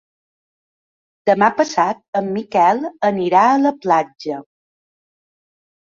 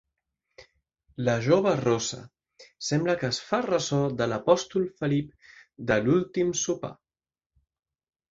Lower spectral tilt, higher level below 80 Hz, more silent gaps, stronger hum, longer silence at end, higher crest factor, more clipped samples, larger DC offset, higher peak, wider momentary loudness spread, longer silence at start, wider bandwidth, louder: about the same, -5.5 dB/octave vs -5 dB/octave; second, -66 dBFS vs -60 dBFS; first, 2.08-2.13 s vs none; neither; about the same, 1.4 s vs 1.4 s; about the same, 18 dB vs 22 dB; neither; neither; first, -2 dBFS vs -6 dBFS; about the same, 11 LU vs 12 LU; first, 1.25 s vs 0.6 s; about the same, 7.6 kHz vs 7.8 kHz; first, -17 LUFS vs -26 LUFS